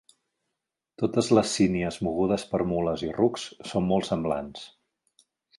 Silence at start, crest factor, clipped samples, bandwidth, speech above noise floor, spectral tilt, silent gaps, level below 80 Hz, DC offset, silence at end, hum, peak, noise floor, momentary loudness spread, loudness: 1 s; 20 dB; under 0.1%; 11.5 kHz; 59 dB; -5.5 dB/octave; none; -54 dBFS; under 0.1%; 0.9 s; none; -6 dBFS; -85 dBFS; 10 LU; -26 LUFS